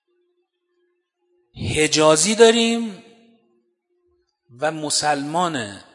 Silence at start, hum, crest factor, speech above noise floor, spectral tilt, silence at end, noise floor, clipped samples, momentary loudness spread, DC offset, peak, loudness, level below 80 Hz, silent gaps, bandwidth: 1.55 s; none; 22 dB; 52 dB; -3 dB/octave; 0.15 s; -70 dBFS; under 0.1%; 13 LU; under 0.1%; 0 dBFS; -18 LUFS; -54 dBFS; none; 11 kHz